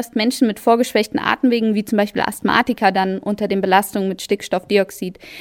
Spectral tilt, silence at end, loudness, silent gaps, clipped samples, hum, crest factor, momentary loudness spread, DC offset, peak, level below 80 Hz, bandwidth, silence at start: -5 dB/octave; 0 s; -18 LUFS; none; under 0.1%; none; 18 dB; 7 LU; under 0.1%; 0 dBFS; -54 dBFS; 18 kHz; 0 s